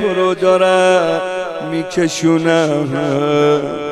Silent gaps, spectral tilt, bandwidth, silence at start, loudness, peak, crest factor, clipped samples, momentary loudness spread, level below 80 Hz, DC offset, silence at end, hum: none; -5 dB/octave; 13 kHz; 0 s; -14 LUFS; -2 dBFS; 14 dB; under 0.1%; 9 LU; -56 dBFS; under 0.1%; 0 s; none